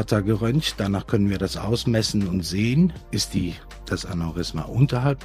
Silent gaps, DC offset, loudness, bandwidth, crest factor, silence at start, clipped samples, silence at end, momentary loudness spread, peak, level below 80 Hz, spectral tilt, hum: none; under 0.1%; -23 LUFS; 15.5 kHz; 18 dB; 0 s; under 0.1%; 0 s; 8 LU; -4 dBFS; -40 dBFS; -6 dB/octave; none